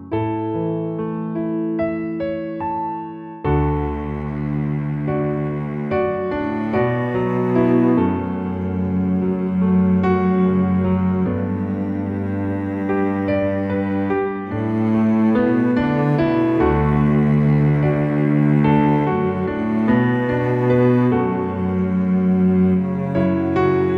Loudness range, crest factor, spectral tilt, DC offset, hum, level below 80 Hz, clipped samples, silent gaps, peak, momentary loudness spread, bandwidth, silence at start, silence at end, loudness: 6 LU; 14 dB; -10.5 dB/octave; under 0.1%; none; -38 dBFS; under 0.1%; none; -4 dBFS; 8 LU; 5.2 kHz; 0 s; 0 s; -19 LUFS